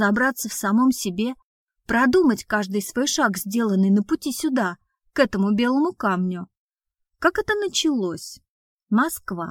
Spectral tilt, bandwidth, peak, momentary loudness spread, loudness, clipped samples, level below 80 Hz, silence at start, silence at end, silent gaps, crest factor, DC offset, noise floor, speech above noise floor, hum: -4.5 dB/octave; 17.5 kHz; -4 dBFS; 10 LU; -22 LUFS; under 0.1%; -54 dBFS; 0 s; 0 s; 1.43-1.67 s, 6.57-6.69 s, 8.49-8.79 s; 18 dB; under 0.1%; -79 dBFS; 57 dB; none